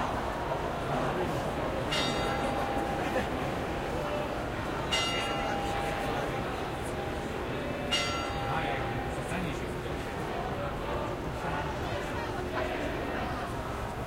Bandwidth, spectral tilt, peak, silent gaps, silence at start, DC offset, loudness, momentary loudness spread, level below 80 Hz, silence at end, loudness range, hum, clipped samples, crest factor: 16 kHz; -5 dB/octave; -16 dBFS; none; 0 s; under 0.1%; -32 LUFS; 6 LU; -44 dBFS; 0 s; 3 LU; none; under 0.1%; 18 dB